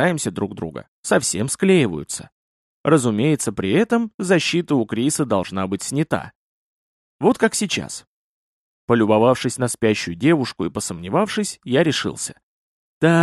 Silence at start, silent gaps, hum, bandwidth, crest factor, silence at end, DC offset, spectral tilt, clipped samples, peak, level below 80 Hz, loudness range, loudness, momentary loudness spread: 0 s; 0.88-1.03 s, 2.32-2.84 s, 4.14-4.18 s, 6.35-7.19 s, 8.07-8.88 s, 12.43-13.01 s; none; 13 kHz; 18 dB; 0 s; under 0.1%; -5 dB/octave; under 0.1%; -2 dBFS; -56 dBFS; 3 LU; -20 LUFS; 11 LU